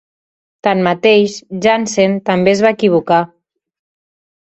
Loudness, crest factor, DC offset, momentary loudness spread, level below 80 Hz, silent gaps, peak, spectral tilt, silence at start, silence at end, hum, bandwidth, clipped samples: -13 LUFS; 14 dB; under 0.1%; 6 LU; -56 dBFS; none; 0 dBFS; -5 dB/octave; 0.65 s; 1.15 s; none; 8.2 kHz; under 0.1%